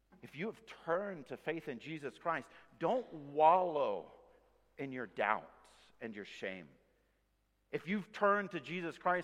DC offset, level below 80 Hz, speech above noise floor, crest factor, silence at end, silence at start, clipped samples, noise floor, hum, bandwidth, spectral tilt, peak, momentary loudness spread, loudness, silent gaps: under 0.1%; -78 dBFS; 41 dB; 22 dB; 0 s; 0.25 s; under 0.1%; -78 dBFS; none; 12.5 kHz; -6.5 dB/octave; -16 dBFS; 16 LU; -37 LUFS; none